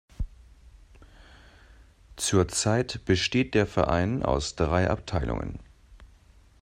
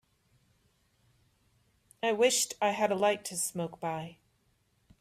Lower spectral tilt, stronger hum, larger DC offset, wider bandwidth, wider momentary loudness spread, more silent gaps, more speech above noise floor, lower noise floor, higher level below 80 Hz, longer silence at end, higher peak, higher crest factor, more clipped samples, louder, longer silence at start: first, -5 dB/octave vs -2.5 dB/octave; neither; neither; about the same, 14.5 kHz vs 15.5 kHz; first, 15 LU vs 11 LU; neither; second, 30 dB vs 42 dB; second, -56 dBFS vs -72 dBFS; first, -42 dBFS vs -74 dBFS; second, 0.55 s vs 0.9 s; first, -8 dBFS vs -14 dBFS; about the same, 20 dB vs 20 dB; neither; first, -26 LUFS vs -30 LUFS; second, 0.2 s vs 2.05 s